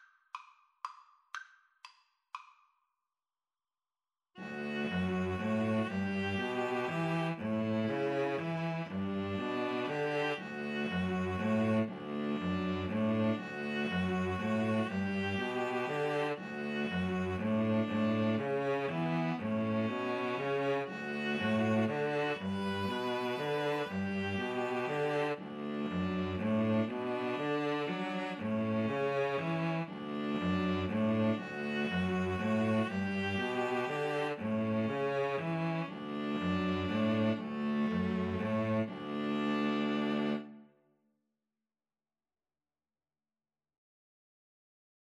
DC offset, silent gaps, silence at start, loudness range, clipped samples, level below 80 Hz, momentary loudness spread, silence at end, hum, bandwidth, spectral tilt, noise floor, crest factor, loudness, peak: under 0.1%; none; 0.35 s; 4 LU; under 0.1%; -68 dBFS; 6 LU; 4.55 s; none; 11.5 kHz; -7 dB/octave; under -90 dBFS; 14 dB; -34 LUFS; -20 dBFS